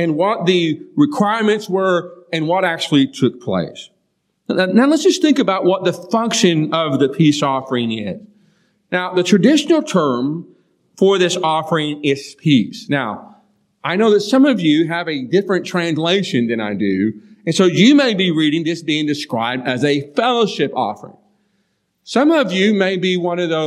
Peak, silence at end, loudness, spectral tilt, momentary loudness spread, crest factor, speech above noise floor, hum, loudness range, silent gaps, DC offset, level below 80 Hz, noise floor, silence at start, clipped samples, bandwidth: 0 dBFS; 0 s; -16 LUFS; -5 dB/octave; 9 LU; 16 dB; 52 dB; none; 3 LU; none; under 0.1%; -68 dBFS; -67 dBFS; 0 s; under 0.1%; 13 kHz